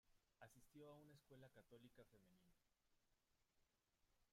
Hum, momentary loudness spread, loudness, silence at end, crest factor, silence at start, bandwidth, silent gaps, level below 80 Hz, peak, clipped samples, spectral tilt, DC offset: none; 4 LU; -68 LUFS; 0 s; 20 dB; 0.05 s; 15 kHz; none; -88 dBFS; -50 dBFS; under 0.1%; -5.5 dB/octave; under 0.1%